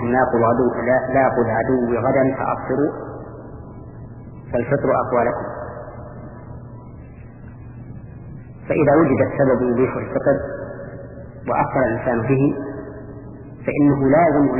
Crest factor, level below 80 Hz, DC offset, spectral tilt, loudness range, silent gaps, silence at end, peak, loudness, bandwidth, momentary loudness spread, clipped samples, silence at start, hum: 16 dB; -44 dBFS; under 0.1%; -13 dB/octave; 6 LU; none; 0 s; -4 dBFS; -19 LUFS; 2.9 kHz; 21 LU; under 0.1%; 0 s; none